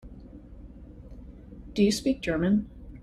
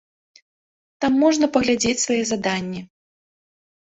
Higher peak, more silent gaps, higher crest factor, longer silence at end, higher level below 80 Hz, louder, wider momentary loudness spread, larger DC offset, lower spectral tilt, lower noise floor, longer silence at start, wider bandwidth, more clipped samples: second, -10 dBFS vs -4 dBFS; neither; about the same, 18 dB vs 20 dB; second, 0 s vs 1.1 s; first, -46 dBFS vs -56 dBFS; second, -26 LUFS vs -20 LUFS; first, 24 LU vs 9 LU; neither; first, -5.5 dB/octave vs -3.5 dB/octave; second, -46 dBFS vs under -90 dBFS; second, 0.05 s vs 1 s; first, 13 kHz vs 8.4 kHz; neither